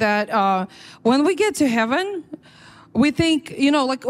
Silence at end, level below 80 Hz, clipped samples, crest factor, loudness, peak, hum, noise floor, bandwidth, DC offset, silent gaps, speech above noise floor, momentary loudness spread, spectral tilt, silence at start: 0 s; -52 dBFS; under 0.1%; 16 dB; -19 LUFS; -4 dBFS; none; -47 dBFS; 14.5 kHz; under 0.1%; none; 27 dB; 13 LU; -4.5 dB/octave; 0 s